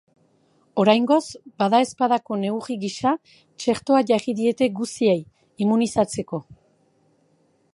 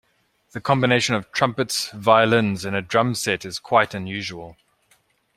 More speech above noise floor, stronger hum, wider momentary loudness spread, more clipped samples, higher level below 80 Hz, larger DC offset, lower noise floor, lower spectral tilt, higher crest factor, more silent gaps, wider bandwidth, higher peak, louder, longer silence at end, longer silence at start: about the same, 42 dB vs 43 dB; neither; about the same, 10 LU vs 12 LU; neither; about the same, -62 dBFS vs -60 dBFS; neither; about the same, -63 dBFS vs -64 dBFS; about the same, -5.5 dB/octave vs -4.5 dB/octave; about the same, 20 dB vs 20 dB; neither; second, 11.5 kHz vs 16 kHz; about the same, -2 dBFS vs -2 dBFS; about the same, -22 LUFS vs -21 LUFS; first, 1.2 s vs 0.85 s; first, 0.75 s vs 0.55 s